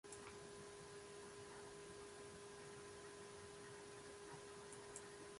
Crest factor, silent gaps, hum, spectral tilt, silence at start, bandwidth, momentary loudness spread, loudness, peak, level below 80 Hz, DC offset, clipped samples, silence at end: 20 dB; none; none; -3 dB/octave; 0.05 s; 11.5 kHz; 2 LU; -57 LUFS; -36 dBFS; -78 dBFS; under 0.1%; under 0.1%; 0 s